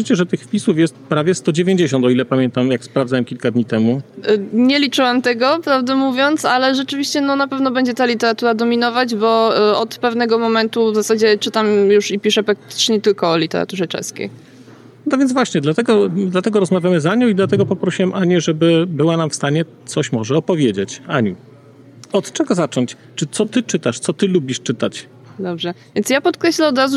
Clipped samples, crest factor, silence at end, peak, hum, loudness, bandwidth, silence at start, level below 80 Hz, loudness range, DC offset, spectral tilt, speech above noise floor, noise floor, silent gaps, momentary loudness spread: under 0.1%; 12 dB; 0 s; -4 dBFS; none; -16 LUFS; 13.5 kHz; 0 s; -66 dBFS; 4 LU; under 0.1%; -5 dB/octave; 27 dB; -42 dBFS; none; 7 LU